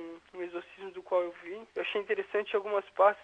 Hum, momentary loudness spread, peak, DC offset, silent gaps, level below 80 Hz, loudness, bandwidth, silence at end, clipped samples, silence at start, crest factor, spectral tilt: none; 16 LU; -12 dBFS; under 0.1%; none; -78 dBFS; -33 LUFS; 8.2 kHz; 0 s; under 0.1%; 0 s; 20 dB; -5 dB/octave